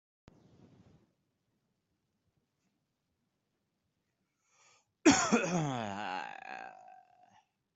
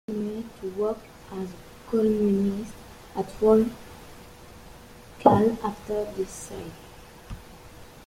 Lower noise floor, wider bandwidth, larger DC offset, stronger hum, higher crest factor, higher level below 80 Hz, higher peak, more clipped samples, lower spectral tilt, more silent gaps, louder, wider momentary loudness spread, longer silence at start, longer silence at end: first, -83 dBFS vs -47 dBFS; second, 8.2 kHz vs 16 kHz; neither; neither; about the same, 28 dB vs 26 dB; second, -70 dBFS vs -50 dBFS; second, -10 dBFS vs -2 dBFS; neither; second, -4 dB/octave vs -7 dB/octave; neither; second, -31 LUFS vs -26 LUFS; second, 20 LU vs 26 LU; first, 5.05 s vs 0.1 s; first, 1 s vs 0.05 s